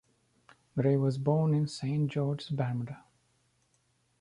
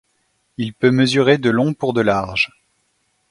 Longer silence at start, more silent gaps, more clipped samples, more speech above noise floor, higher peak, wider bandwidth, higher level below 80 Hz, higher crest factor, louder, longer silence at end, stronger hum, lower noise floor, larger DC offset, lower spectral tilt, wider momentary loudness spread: first, 0.75 s vs 0.6 s; neither; neither; second, 43 dB vs 49 dB; second, -14 dBFS vs 0 dBFS; about the same, 10.5 kHz vs 11.5 kHz; second, -68 dBFS vs -52 dBFS; about the same, 18 dB vs 18 dB; second, -31 LUFS vs -17 LUFS; first, 1.2 s vs 0.85 s; neither; first, -73 dBFS vs -66 dBFS; neither; first, -8 dB/octave vs -6 dB/octave; about the same, 11 LU vs 12 LU